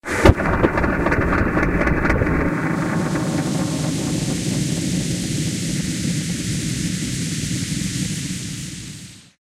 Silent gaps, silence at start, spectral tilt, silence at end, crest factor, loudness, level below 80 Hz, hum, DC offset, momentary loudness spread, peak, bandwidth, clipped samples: none; 0.05 s; -5 dB/octave; 0.2 s; 20 dB; -21 LUFS; -30 dBFS; none; under 0.1%; 7 LU; 0 dBFS; 16 kHz; under 0.1%